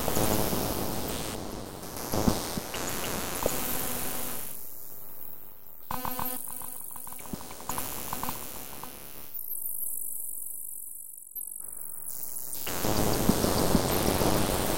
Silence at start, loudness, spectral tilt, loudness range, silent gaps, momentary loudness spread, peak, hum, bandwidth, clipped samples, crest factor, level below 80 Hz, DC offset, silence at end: 0 s; -31 LUFS; -4 dB/octave; 7 LU; none; 14 LU; -8 dBFS; none; 16.5 kHz; under 0.1%; 22 dB; -44 dBFS; 1%; 0 s